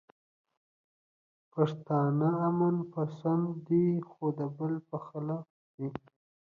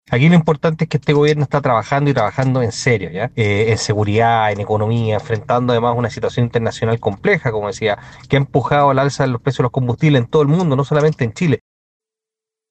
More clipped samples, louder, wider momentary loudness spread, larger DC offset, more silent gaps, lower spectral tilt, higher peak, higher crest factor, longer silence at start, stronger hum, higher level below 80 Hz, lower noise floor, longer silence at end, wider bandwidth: neither; second, -32 LUFS vs -16 LUFS; first, 12 LU vs 5 LU; neither; first, 5.50-5.78 s vs none; first, -10.5 dB/octave vs -6.5 dB/octave; second, -14 dBFS vs 0 dBFS; about the same, 18 dB vs 16 dB; first, 1.55 s vs 0.1 s; neither; second, -74 dBFS vs -46 dBFS; about the same, under -90 dBFS vs -87 dBFS; second, 0.5 s vs 1.15 s; second, 4.7 kHz vs 8.8 kHz